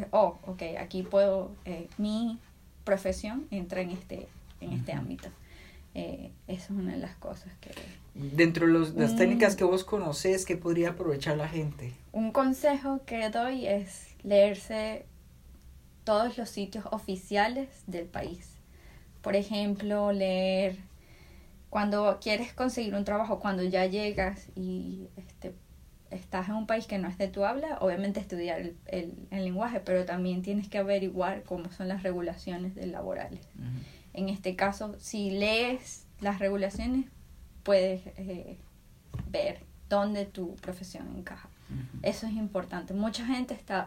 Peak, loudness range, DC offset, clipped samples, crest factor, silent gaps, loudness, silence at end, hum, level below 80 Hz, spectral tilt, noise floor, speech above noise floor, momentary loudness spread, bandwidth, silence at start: -8 dBFS; 8 LU; under 0.1%; under 0.1%; 24 dB; none; -31 LUFS; 0 s; none; -52 dBFS; -5.5 dB/octave; -53 dBFS; 22 dB; 16 LU; 16 kHz; 0 s